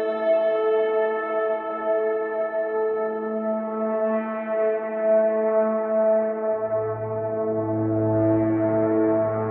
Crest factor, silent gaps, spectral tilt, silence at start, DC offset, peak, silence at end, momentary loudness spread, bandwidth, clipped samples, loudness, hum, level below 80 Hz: 12 dB; none; -11.5 dB/octave; 0 s; under 0.1%; -10 dBFS; 0 s; 5 LU; 4.2 kHz; under 0.1%; -23 LUFS; none; -60 dBFS